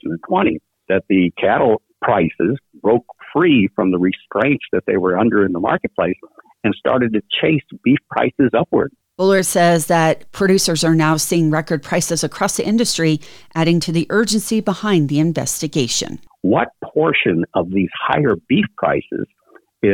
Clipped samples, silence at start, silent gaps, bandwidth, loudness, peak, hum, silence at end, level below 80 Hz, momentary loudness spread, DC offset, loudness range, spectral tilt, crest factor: under 0.1%; 0.05 s; none; 19.5 kHz; -17 LUFS; -4 dBFS; none; 0 s; -50 dBFS; 6 LU; under 0.1%; 3 LU; -5 dB/octave; 14 dB